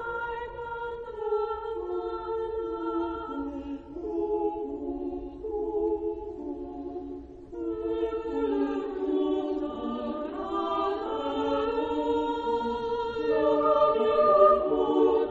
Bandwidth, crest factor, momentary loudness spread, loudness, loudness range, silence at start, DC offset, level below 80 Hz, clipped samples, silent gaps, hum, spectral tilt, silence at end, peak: 7.4 kHz; 20 dB; 14 LU; -29 LUFS; 8 LU; 0 s; under 0.1%; -52 dBFS; under 0.1%; none; none; -7 dB/octave; 0 s; -8 dBFS